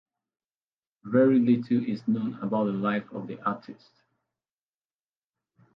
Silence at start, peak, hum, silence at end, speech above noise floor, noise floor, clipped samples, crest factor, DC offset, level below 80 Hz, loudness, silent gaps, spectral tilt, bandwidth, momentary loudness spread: 1.05 s; -10 dBFS; none; 2.05 s; over 64 dB; under -90 dBFS; under 0.1%; 18 dB; under 0.1%; -74 dBFS; -26 LUFS; none; -10 dB/octave; 5.4 kHz; 11 LU